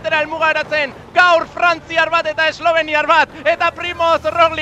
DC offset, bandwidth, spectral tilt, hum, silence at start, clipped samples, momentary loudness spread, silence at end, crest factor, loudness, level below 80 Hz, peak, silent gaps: under 0.1%; 8.6 kHz; -3 dB/octave; none; 0 s; under 0.1%; 5 LU; 0 s; 16 dB; -15 LUFS; -50 dBFS; 0 dBFS; none